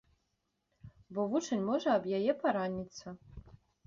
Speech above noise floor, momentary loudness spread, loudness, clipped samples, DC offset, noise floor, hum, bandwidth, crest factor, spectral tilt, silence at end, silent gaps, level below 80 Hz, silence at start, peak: 48 dB; 17 LU; -33 LUFS; under 0.1%; under 0.1%; -82 dBFS; none; 7.6 kHz; 18 dB; -5 dB/octave; 0.35 s; none; -64 dBFS; 0.85 s; -18 dBFS